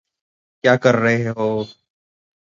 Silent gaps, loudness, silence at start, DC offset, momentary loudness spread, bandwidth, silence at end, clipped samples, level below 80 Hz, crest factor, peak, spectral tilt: none; -18 LUFS; 0.65 s; under 0.1%; 10 LU; 7.6 kHz; 0.85 s; under 0.1%; -62 dBFS; 20 dB; 0 dBFS; -6.5 dB/octave